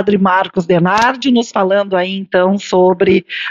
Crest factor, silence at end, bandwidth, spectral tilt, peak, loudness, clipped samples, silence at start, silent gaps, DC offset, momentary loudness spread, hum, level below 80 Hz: 12 dB; 0 s; 7.8 kHz; -6 dB/octave; -2 dBFS; -13 LUFS; under 0.1%; 0 s; none; under 0.1%; 4 LU; none; -50 dBFS